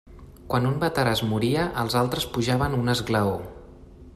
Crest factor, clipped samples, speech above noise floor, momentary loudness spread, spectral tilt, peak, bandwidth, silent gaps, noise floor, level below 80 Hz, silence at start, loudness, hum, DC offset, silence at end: 16 dB; under 0.1%; 22 dB; 4 LU; -5.5 dB/octave; -10 dBFS; 15 kHz; none; -46 dBFS; -46 dBFS; 0.05 s; -24 LUFS; none; under 0.1%; 0.05 s